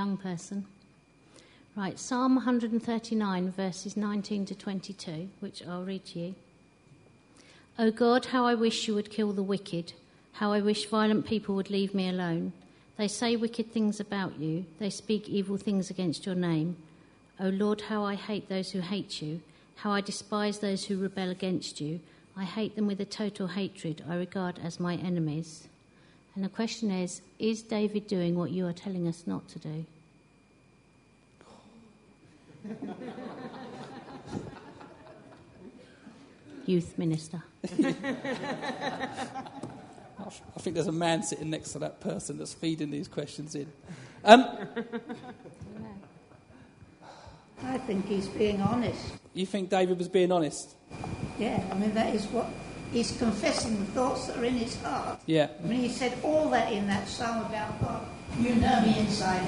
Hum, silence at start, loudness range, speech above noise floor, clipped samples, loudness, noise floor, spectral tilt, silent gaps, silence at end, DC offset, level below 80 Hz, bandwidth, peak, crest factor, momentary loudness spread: none; 0 s; 13 LU; 31 dB; under 0.1%; -31 LUFS; -61 dBFS; -5.5 dB/octave; none; 0 s; under 0.1%; -58 dBFS; 10.5 kHz; 0 dBFS; 30 dB; 17 LU